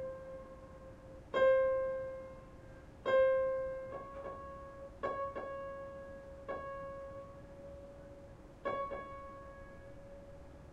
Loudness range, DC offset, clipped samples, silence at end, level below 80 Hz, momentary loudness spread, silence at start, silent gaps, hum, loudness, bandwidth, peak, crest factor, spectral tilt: 12 LU; under 0.1%; under 0.1%; 0 s; -60 dBFS; 23 LU; 0 s; none; none; -37 LUFS; 7.4 kHz; -20 dBFS; 20 dB; -6 dB/octave